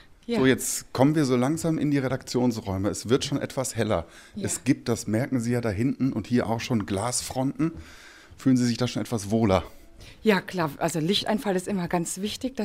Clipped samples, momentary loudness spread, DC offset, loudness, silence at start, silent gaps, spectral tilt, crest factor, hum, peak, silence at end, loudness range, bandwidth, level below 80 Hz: under 0.1%; 7 LU; under 0.1%; -26 LUFS; 0.3 s; none; -5 dB/octave; 20 dB; none; -6 dBFS; 0 s; 2 LU; 16 kHz; -52 dBFS